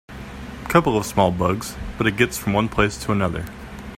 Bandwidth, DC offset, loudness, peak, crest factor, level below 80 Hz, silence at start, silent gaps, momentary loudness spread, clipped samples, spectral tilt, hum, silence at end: 16 kHz; under 0.1%; -21 LUFS; -2 dBFS; 20 dB; -38 dBFS; 0.1 s; none; 16 LU; under 0.1%; -5.5 dB/octave; none; 0 s